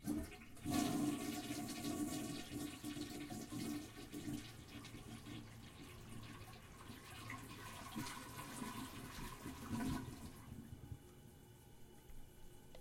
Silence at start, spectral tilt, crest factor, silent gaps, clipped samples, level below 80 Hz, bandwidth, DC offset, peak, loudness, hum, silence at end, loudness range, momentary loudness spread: 0 s; -4.5 dB/octave; 22 dB; none; under 0.1%; -62 dBFS; 16.5 kHz; under 0.1%; -26 dBFS; -48 LUFS; none; 0 s; 9 LU; 19 LU